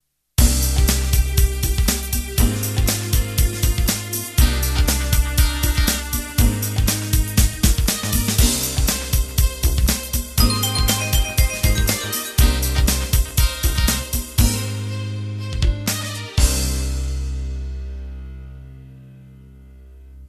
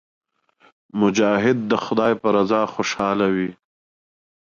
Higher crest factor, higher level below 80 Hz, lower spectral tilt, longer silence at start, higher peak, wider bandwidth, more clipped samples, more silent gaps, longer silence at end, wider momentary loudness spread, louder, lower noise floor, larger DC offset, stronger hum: about the same, 18 dB vs 16 dB; first, -20 dBFS vs -60 dBFS; second, -3.5 dB/octave vs -5.5 dB/octave; second, 0.4 s vs 0.95 s; first, 0 dBFS vs -6 dBFS; first, 14 kHz vs 7.4 kHz; neither; neither; second, 0 s vs 1 s; first, 9 LU vs 6 LU; about the same, -20 LUFS vs -20 LUFS; second, -42 dBFS vs -58 dBFS; neither; neither